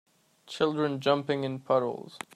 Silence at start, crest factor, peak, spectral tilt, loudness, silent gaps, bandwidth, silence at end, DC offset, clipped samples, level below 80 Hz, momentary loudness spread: 0.45 s; 20 dB; -10 dBFS; -6 dB/octave; -29 LUFS; none; 14 kHz; 0.2 s; under 0.1%; under 0.1%; -74 dBFS; 10 LU